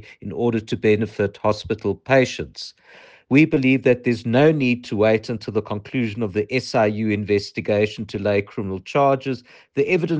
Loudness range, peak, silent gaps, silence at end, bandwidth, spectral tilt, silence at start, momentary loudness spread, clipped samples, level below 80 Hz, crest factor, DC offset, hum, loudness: 3 LU; -4 dBFS; none; 0 s; 9 kHz; -7 dB/octave; 0.1 s; 11 LU; under 0.1%; -54 dBFS; 16 dB; under 0.1%; none; -21 LUFS